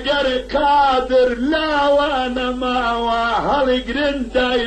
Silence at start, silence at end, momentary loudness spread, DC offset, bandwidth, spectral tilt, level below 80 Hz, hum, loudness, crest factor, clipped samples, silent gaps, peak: 0 s; 0 s; 5 LU; under 0.1%; 9 kHz; -4.5 dB/octave; -36 dBFS; none; -17 LUFS; 12 dB; under 0.1%; none; -6 dBFS